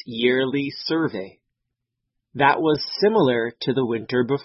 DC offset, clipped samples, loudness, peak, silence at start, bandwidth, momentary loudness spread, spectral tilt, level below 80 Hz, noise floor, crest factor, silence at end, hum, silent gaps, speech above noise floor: under 0.1%; under 0.1%; -21 LUFS; -4 dBFS; 0.05 s; 6 kHz; 8 LU; -8.5 dB/octave; -62 dBFS; -81 dBFS; 20 dB; 0 s; none; none; 59 dB